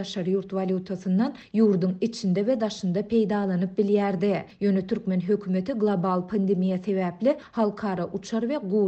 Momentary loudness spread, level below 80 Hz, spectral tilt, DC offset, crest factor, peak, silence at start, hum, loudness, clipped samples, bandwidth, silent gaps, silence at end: 5 LU; -62 dBFS; -7.5 dB/octave; under 0.1%; 14 dB; -12 dBFS; 0 s; none; -26 LUFS; under 0.1%; 8.2 kHz; none; 0 s